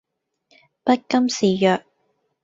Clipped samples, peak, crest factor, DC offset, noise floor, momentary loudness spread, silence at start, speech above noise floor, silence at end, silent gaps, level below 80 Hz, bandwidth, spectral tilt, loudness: under 0.1%; -4 dBFS; 18 dB; under 0.1%; -69 dBFS; 7 LU; 0.85 s; 51 dB; 0.65 s; none; -66 dBFS; 7.8 kHz; -5 dB/octave; -20 LUFS